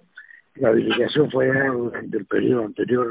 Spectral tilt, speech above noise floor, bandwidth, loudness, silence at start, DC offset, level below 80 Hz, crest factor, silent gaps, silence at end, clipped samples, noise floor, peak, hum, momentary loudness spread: -10.5 dB/octave; 27 dB; 4 kHz; -21 LUFS; 0.15 s; under 0.1%; -58 dBFS; 16 dB; none; 0 s; under 0.1%; -47 dBFS; -4 dBFS; none; 7 LU